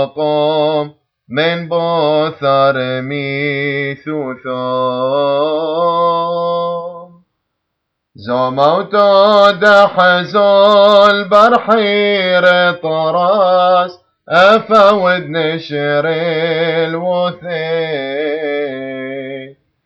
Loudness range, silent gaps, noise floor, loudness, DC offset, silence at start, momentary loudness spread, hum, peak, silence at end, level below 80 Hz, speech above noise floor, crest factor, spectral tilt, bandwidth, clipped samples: 8 LU; none; -73 dBFS; -12 LUFS; under 0.1%; 0 s; 13 LU; none; 0 dBFS; 0.35 s; -60 dBFS; 61 dB; 12 dB; -6 dB/octave; 8 kHz; under 0.1%